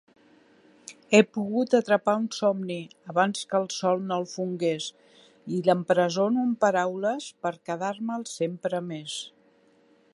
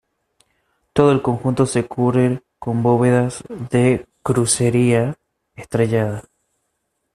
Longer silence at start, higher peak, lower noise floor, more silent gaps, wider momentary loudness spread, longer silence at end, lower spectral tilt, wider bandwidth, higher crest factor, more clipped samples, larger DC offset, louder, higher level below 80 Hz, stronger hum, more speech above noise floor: about the same, 0.9 s vs 0.95 s; about the same, -4 dBFS vs -2 dBFS; second, -61 dBFS vs -73 dBFS; neither; about the same, 12 LU vs 10 LU; about the same, 0.85 s vs 0.95 s; about the same, -5 dB/octave vs -6 dB/octave; second, 11.5 kHz vs 13 kHz; first, 22 dB vs 16 dB; neither; neither; second, -26 LUFS vs -18 LUFS; second, -78 dBFS vs -50 dBFS; neither; second, 35 dB vs 56 dB